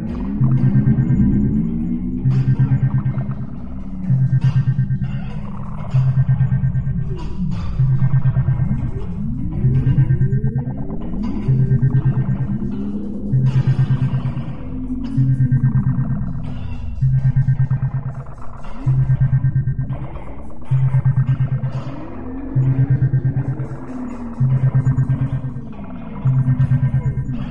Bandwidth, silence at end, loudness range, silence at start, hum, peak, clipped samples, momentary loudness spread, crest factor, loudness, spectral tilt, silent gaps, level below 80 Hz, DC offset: 3.4 kHz; 0 s; 2 LU; 0 s; none; -4 dBFS; under 0.1%; 13 LU; 14 dB; -19 LUFS; -10.5 dB/octave; none; -32 dBFS; 4%